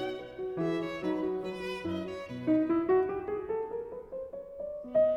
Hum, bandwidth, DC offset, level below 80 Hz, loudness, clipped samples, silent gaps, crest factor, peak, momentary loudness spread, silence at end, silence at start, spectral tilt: none; 10 kHz; under 0.1%; -62 dBFS; -33 LUFS; under 0.1%; none; 14 dB; -18 dBFS; 13 LU; 0 s; 0 s; -7.5 dB/octave